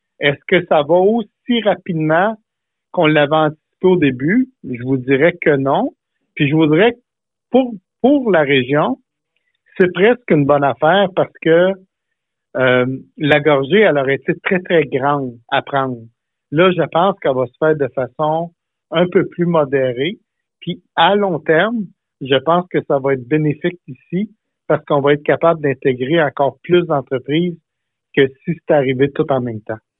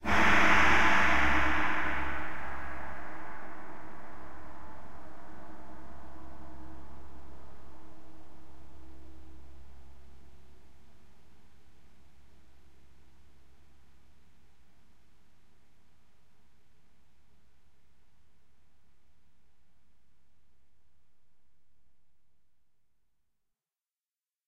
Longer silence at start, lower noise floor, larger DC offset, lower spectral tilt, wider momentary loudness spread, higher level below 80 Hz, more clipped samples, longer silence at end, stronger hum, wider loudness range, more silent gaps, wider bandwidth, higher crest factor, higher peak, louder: first, 0.2 s vs 0 s; second, -79 dBFS vs under -90 dBFS; neither; first, -9.5 dB/octave vs -4 dB/octave; second, 10 LU vs 28 LU; second, -58 dBFS vs -50 dBFS; neither; first, 0.2 s vs 0 s; neither; second, 2 LU vs 29 LU; neither; second, 4.1 kHz vs 16 kHz; second, 16 dB vs 22 dB; first, 0 dBFS vs -10 dBFS; first, -16 LUFS vs -27 LUFS